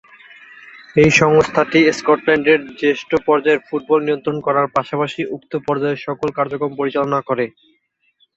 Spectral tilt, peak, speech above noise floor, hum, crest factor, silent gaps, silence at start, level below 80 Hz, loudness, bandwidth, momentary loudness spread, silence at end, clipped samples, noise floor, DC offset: -5.5 dB/octave; 0 dBFS; 47 dB; none; 18 dB; none; 0.75 s; -52 dBFS; -17 LUFS; 8 kHz; 9 LU; 0.9 s; under 0.1%; -63 dBFS; under 0.1%